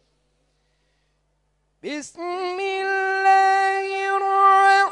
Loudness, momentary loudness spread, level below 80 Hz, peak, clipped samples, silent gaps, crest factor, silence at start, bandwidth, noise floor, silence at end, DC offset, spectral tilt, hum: -19 LUFS; 17 LU; -70 dBFS; -6 dBFS; under 0.1%; none; 16 dB; 1.85 s; 10.5 kHz; -68 dBFS; 0 s; under 0.1%; -1.5 dB/octave; 50 Hz at -70 dBFS